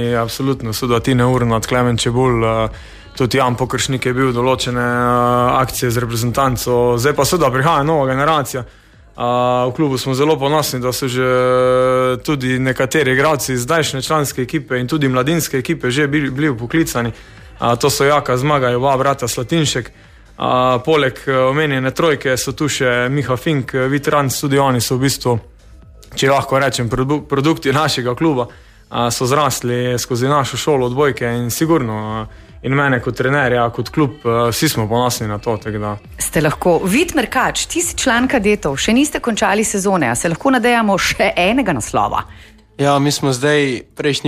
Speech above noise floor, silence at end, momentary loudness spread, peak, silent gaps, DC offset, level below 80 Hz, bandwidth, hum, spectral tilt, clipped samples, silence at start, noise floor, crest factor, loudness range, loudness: 25 dB; 0 s; 6 LU; -2 dBFS; none; under 0.1%; -40 dBFS; 15.5 kHz; none; -4.5 dB/octave; under 0.1%; 0 s; -41 dBFS; 14 dB; 2 LU; -16 LUFS